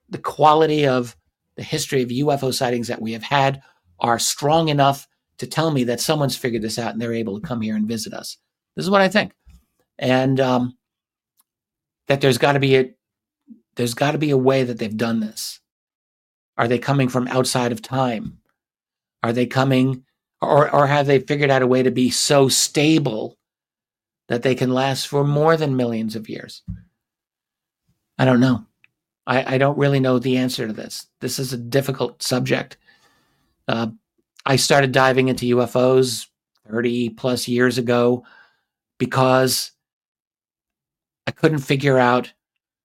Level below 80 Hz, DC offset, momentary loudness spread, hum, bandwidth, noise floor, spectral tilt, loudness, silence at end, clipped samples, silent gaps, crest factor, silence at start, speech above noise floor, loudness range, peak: -58 dBFS; under 0.1%; 14 LU; none; 16.5 kHz; under -90 dBFS; -5 dB/octave; -19 LUFS; 0.55 s; under 0.1%; 15.71-15.87 s, 15.95-16.53 s, 39.93-40.15 s, 40.27-40.31 s; 20 dB; 0.1 s; over 71 dB; 5 LU; -2 dBFS